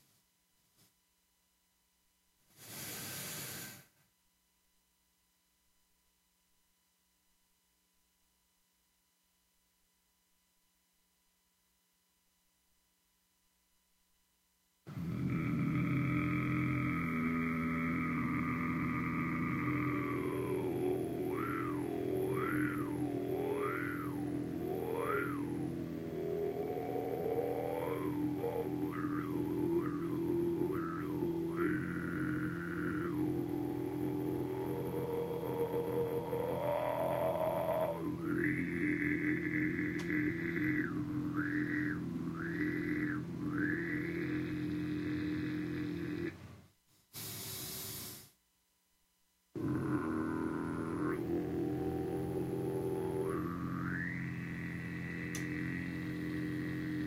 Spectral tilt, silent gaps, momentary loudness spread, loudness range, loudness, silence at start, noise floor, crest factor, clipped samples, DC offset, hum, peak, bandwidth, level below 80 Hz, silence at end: -6.5 dB/octave; none; 7 LU; 10 LU; -37 LUFS; 2.6 s; -77 dBFS; 16 dB; under 0.1%; under 0.1%; none; -22 dBFS; 16 kHz; -62 dBFS; 0 s